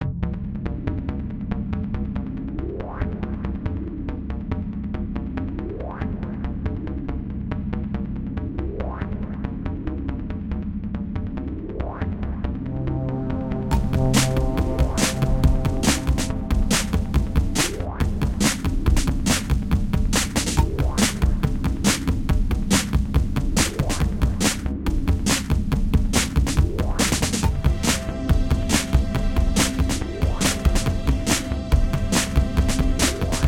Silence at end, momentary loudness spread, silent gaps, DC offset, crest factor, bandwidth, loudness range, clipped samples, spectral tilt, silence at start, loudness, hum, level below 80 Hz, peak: 0 s; 9 LU; none; under 0.1%; 18 dB; 17 kHz; 7 LU; under 0.1%; -4.5 dB/octave; 0 s; -24 LUFS; none; -26 dBFS; -4 dBFS